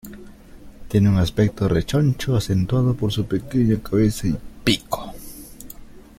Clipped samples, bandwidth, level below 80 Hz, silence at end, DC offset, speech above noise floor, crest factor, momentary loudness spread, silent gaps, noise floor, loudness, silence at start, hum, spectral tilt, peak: under 0.1%; 16.5 kHz; -38 dBFS; 0.2 s; under 0.1%; 22 dB; 20 dB; 20 LU; none; -42 dBFS; -21 LUFS; 0.05 s; none; -6.5 dB/octave; -2 dBFS